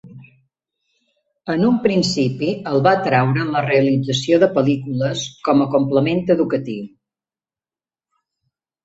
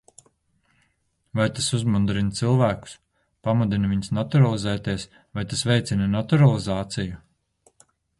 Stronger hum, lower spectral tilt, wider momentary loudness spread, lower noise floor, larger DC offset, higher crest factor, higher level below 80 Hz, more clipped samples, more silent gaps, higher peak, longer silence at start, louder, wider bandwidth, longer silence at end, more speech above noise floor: neither; about the same, -6 dB/octave vs -6 dB/octave; second, 8 LU vs 13 LU; first, under -90 dBFS vs -70 dBFS; neither; about the same, 18 dB vs 18 dB; second, -56 dBFS vs -48 dBFS; neither; neither; first, -2 dBFS vs -6 dBFS; second, 0.05 s vs 1.35 s; first, -18 LUFS vs -23 LUFS; second, 8 kHz vs 11.5 kHz; first, 1.95 s vs 1 s; first, over 73 dB vs 48 dB